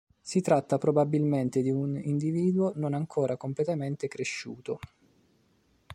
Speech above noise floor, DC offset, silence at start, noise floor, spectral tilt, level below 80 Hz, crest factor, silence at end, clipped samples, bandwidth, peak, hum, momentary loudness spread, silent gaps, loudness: 39 dB; under 0.1%; 0.25 s; -67 dBFS; -7 dB/octave; -66 dBFS; 20 dB; 0 s; under 0.1%; 11.5 kHz; -10 dBFS; none; 10 LU; none; -29 LUFS